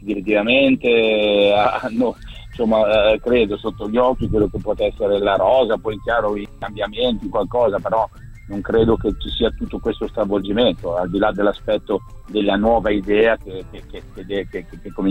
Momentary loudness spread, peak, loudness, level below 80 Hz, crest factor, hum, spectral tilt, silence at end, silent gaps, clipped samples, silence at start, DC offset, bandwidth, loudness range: 12 LU; -2 dBFS; -18 LUFS; -36 dBFS; 18 dB; none; -7 dB/octave; 0 s; none; under 0.1%; 0 s; under 0.1%; 8.4 kHz; 4 LU